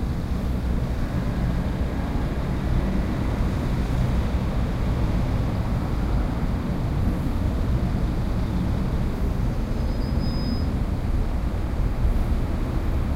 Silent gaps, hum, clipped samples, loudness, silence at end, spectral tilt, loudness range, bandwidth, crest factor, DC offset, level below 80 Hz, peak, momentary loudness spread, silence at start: none; none; under 0.1%; -26 LUFS; 0 s; -8 dB/octave; 1 LU; 15 kHz; 12 dB; under 0.1%; -26 dBFS; -10 dBFS; 2 LU; 0 s